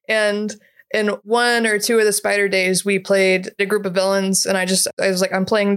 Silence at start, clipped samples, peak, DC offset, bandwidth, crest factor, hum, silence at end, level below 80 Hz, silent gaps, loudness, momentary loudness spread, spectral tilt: 0.1 s; under 0.1%; -6 dBFS; under 0.1%; 16.5 kHz; 12 dB; none; 0 s; -68 dBFS; 4.93-4.97 s; -17 LUFS; 5 LU; -3 dB/octave